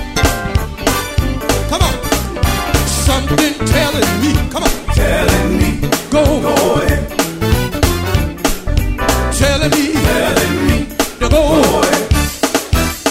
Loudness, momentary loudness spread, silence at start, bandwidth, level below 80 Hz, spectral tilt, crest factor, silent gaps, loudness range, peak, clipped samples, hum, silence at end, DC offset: -14 LUFS; 5 LU; 0 s; 16.5 kHz; -20 dBFS; -4.5 dB/octave; 12 dB; none; 2 LU; 0 dBFS; under 0.1%; none; 0 s; under 0.1%